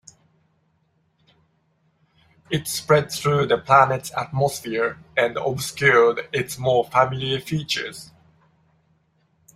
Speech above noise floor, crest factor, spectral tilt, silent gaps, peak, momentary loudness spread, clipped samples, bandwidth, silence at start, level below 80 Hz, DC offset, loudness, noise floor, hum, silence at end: 46 dB; 22 dB; -4.5 dB/octave; none; -2 dBFS; 10 LU; under 0.1%; 16 kHz; 2.5 s; -58 dBFS; under 0.1%; -21 LUFS; -66 dBFS; none; 1.5 s